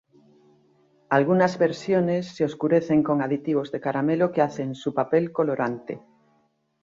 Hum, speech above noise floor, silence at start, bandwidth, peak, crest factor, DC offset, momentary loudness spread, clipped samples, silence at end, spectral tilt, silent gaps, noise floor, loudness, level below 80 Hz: none; 44 dB; 1.1 s; 7.6 kHz; -6 dBFS; 18 dB; under 0.1%; 7 LU; under 0.1%; 0.85 s; -7.5 dB/octave; none; -67 dBFS; -24 LUFS; -66 dBFS